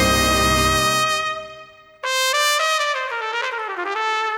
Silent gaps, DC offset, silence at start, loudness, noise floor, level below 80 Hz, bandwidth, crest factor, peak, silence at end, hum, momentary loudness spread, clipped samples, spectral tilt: none; under 0.1%; 0 s; -19 LUFS; -43 dBFS; -36 dBFS; over 20 kHz; 18 dB; -2 dBFS; 0 s; none; 10 LU; under 0.1%; -2.5 dB/octave